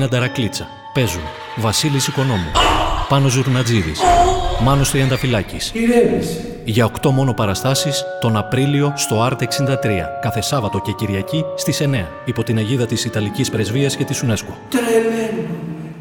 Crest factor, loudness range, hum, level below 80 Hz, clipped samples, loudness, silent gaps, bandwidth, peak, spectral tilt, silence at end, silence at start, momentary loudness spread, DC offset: 18 dB; 4 LU; none; -32 dBFS; under 0.1%; -18 LUFS; none; 19 kHz; 0 dBFS; -5 dB/octave; 0 s; 0 s; 8 LU; under 0.1%